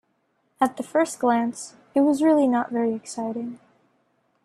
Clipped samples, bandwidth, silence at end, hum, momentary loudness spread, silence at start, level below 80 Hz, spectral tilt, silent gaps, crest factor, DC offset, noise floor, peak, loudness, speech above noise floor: under 0.1%; 13 kHz; 0.9 s; none; 11 LU; 0.6 s; -70 dBFS; -5 dB/octave; none; 18 dB; under 0.1%; -70 dBFS; -6 dBFS; -23 LUFS; 48 dB